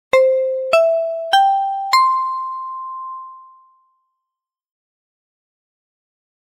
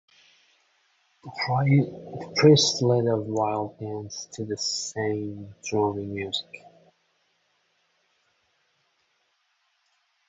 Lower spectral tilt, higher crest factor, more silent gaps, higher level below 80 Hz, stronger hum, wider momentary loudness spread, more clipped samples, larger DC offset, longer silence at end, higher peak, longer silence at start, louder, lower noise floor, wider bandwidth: second, 0 dB/octave vs -5 dB/octave; second, 14 dB vs 22 dB; neither; about the same, -66 dBFS vs -64 dBFS; neither; second, 15 LU vs 18 LU; neither; neither; second, 3.05 s vs 3.7 s; about the same, -6 dBFS vs -6 dBFS; second, 0.15 s vs 1.25 s; first, -16 LUFS vs -25 LUFS; first, -84 dBFS vs -71 dBFS; first, 16 kHz vs 8 kHz